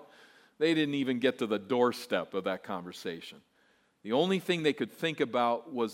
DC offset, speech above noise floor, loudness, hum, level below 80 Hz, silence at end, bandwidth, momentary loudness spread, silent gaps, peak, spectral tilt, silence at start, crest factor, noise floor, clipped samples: under 0.1%; 38 dB; -31 LUFS; none; -82 dBFS; 0 s; 16 kHz; 12 LU; none; -14 dBFS; -5.5 dB/octave; 0 s; 18 dB; -69 dBFS; under 0.1%